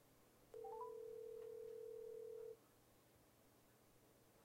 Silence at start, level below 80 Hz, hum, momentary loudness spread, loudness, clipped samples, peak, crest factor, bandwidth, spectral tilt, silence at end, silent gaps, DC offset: 0 s; -84 dBFS; none; 5 LU; -55 LUFS; under 0.1%; -42 dBFS; 14 dB; 16 kHz; -5 dB/octave; 0 s; none; under 0.1%